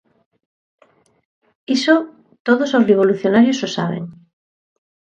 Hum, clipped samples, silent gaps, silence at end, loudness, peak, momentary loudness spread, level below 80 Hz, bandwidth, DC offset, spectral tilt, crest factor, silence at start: none; under 0.1%; 2.40-2.45 s; 0.9 s; -16 LUFS; 0 dBFS; 13 LU; -64 dBFS; 8.6 kHz; under 0.1%; -5.5 dB/octave; 18 dB; 1.7 s